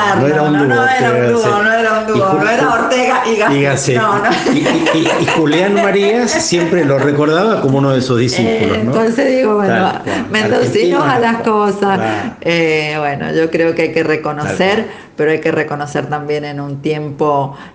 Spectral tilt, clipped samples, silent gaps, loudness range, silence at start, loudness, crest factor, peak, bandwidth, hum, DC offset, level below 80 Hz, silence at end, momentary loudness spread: -5 dB/octave; under 0.1%; none; 3 LU; 0 s; -13 LUFS; 12 dB; 0 dBFS; 9.8 kHz; none; under 0.1%; -50 dBFS; 0.05 s; 6 LU